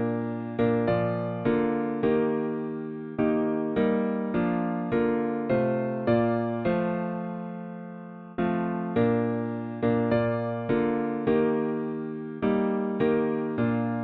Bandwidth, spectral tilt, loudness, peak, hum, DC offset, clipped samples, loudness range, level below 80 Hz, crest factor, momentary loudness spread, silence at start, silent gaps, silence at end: 4.5 kHz; -7.5 dB/octave; -27 LUFS; -12 dBFS; none; under 0.1%; under 0.1%; 2 LU; -56 dBFS; 16 dB; 9 LU; 0 s; none; 0 s